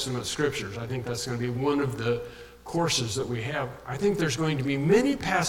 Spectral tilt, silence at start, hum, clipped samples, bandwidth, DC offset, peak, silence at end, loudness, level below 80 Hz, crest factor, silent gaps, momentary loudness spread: -4.5 dB/octave; 0 s; none; under 0.1%; 17.5 kHz; under 0.1%; -8 dBFS; 0 s; -27 LUFS; -52 dBFS; 18 dB; none; 10 LU